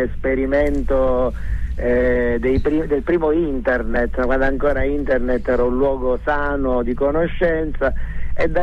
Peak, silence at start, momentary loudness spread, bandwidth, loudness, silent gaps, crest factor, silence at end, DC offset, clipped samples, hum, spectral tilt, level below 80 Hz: -6 dBFS; 0 s; 5 LU; 5 kHz; -19 LUFS; none; 12 dB; 0 s; under 0.1%; under 0.1%; none; -8.5 dB/octave; -26 dBFS